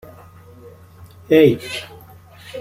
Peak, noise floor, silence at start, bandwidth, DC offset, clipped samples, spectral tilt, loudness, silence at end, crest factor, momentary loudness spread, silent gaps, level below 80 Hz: -2 dBFS; -43 dBFS; 1.3 s; 16 kHz; under 0.1%; under 0.1%; -6.5 dB/octave; -16 LUFS; 0 s; 20 dB; 23 LU; none; -54 dBFS